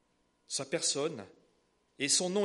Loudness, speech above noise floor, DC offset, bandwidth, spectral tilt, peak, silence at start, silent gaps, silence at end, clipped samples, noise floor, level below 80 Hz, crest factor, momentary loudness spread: -32 LUFS; 40 dB; under 0.1%; 11.5 kHz; -2 dB/octave; -14 dBFS; 0.5 s; none; 0 s; under 0.1%; -73 dBFS; -80 dBFS; 20 dB; 10 LU